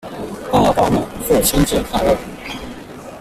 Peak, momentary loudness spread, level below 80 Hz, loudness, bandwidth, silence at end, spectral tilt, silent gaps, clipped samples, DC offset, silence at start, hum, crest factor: -2 dBFS; 16 LU; -32 dBFS; -16 LUFS; 16 kHz; 0 s; -4.5 dB/octave; none; under 0.1%; under 0.1%; 0.05 s; none; 16 dB